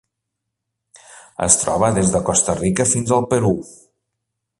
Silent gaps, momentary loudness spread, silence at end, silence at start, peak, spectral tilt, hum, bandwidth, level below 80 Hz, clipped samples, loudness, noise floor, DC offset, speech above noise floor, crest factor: none; 8 LU; 0.85 s; 1.1 s; 0 dBFS; -4.5 dB/octave; none; 11.5 kHz; -44 dBFS; under 0.1%; -17 LUFS; -79 dBFS; under 0.1%; 62 dB; 20 dB